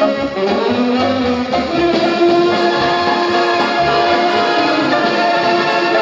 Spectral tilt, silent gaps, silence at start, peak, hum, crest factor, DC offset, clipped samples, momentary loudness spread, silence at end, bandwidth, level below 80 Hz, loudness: -5 dB/octave; none; 0 s; -2 dBFS; none; 12 dB; under 0.1%; under 0.1%; 3 LU; 0 s; 7.8 kHz; -44 dBFS; -14 LUFS